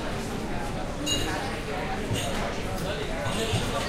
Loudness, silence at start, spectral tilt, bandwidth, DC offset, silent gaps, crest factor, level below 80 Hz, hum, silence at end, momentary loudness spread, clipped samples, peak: -30 LUFS; 0 s; -4 dB/octave; 16 kHz; under 0.1%; none; 16 dB; -38 dBFS; none; 0 s; 5 LU; under 0.1%; -12 dBFS